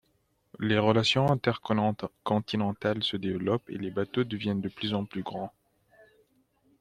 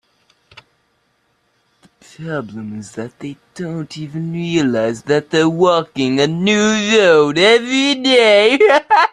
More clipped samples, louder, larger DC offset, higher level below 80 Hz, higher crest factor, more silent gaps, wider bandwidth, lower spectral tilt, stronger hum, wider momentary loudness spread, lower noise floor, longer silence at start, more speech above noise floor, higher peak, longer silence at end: neither; second, -29 LUFS vs -13 LUFS; neither; second, -64 dBFS vs -58 dBFS; first, 22 dB vs 14 dB; neither; about the same, 11 kHz vs 10.5 kHz; first, -6.5 dB/octave vs -4.5 dB/octave; neither; second, 12 LU vs 18 LU; first, -72 dBFS vs -63 dBFS; second, 0.6 s vs 2.2 s; second, 43 dB vs 48 dB; second, -8 dBFS vs 0 dBFS; first, 1.3 s vs 0.05 s